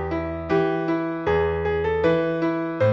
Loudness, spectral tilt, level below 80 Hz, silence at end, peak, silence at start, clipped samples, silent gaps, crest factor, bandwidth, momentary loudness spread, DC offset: -23 LUFS; -8.5 dB/octave; -42 dBFS; 0 s; -10 dBFS; 0 s; under 0.1%; none; 14 dB; 7 kHz; 4 LU; under 0.1%